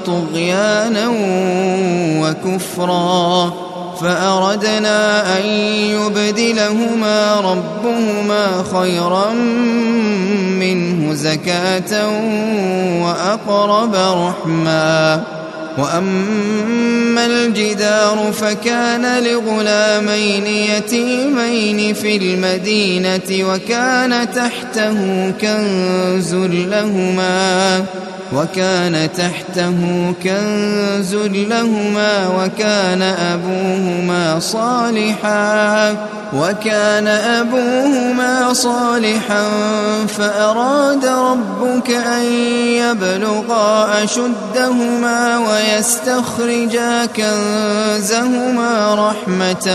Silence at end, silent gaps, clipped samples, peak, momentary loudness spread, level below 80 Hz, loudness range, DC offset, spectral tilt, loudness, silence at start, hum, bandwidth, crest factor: 0 s; none; under 0.1%; 0 dBFS; 4 LU; -58 dBFS; 2 LU; under 0.1%; -4.5 dB/octave; -15 LUFS; 0 s; none; 13 kHz; 14 dB